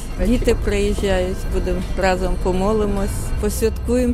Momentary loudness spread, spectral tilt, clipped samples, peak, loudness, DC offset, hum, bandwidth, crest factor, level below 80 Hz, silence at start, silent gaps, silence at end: 5 LU; -6 dB/octave; under 0.1%; -4 dBFS; -20 LUFS; under 0.1%; none; 15.5 kHz; 16 dB; -22 dBFS; 0 s; none; 0 s